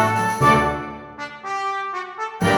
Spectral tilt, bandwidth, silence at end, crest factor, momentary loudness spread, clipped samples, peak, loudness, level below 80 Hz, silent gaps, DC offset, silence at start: -5 dB/octave; 18 kHz; 0 s; 18 dB; 17 LU; under 0.1%; -2 dBFS; -21 LUFS; -44 dBFS; none; under 0.1%; 0 s